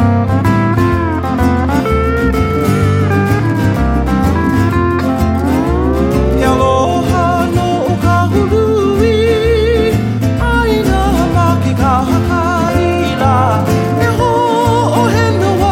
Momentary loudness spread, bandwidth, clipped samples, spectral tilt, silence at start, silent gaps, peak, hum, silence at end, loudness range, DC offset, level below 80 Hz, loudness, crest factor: 2 LU; 16 kHz; under 0.1%; -7 dB/octave; 0 s; none; 0 dBFS; none; 0 s; 1 LU; under 0.1%; -22 dBFS; -12 LUFS; 12 dB